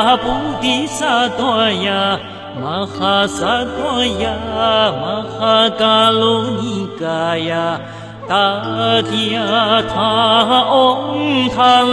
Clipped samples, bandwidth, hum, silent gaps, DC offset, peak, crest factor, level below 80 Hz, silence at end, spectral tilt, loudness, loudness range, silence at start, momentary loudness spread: under 0.1%; 11 kHz; none; none; under 0.1%; 0 dBFS; 14 dB; -44 dBFS; 0 s; -4.5 dB/octave; -15 LUFS; 3 LU; 0 s; 10 LU